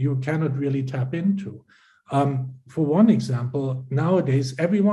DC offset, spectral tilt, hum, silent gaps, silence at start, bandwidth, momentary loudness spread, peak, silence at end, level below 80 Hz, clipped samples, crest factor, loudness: under 0.1%; -8.5 dB/octave; none; none; 0 s; 11.5 kHz; 9 LU; -6 dBFS; 0 s; -62 dBFS; under 0.1%; 16 dB; -23 LUFS